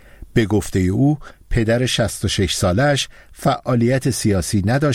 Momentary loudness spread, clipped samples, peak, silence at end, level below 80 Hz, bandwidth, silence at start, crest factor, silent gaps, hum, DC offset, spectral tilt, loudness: 5 LU; under 0.1%; -2 dBFS; 0 s; -34 dBFS; 16.5 kHz; 0.2 s; 16 dB; none; none; under 0.1%; -5.5 dB/octave; -19 LUFS